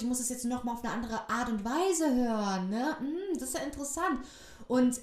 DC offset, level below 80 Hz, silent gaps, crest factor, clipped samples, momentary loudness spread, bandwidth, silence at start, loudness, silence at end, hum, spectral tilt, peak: under 0.1%; -56 dBFS; none; 14 dB; under 0.1%; 7 LU; 15.5 kHz; 0 s; -32 LUFS; 0 s; none; -4 dB/octave; -16 dBFS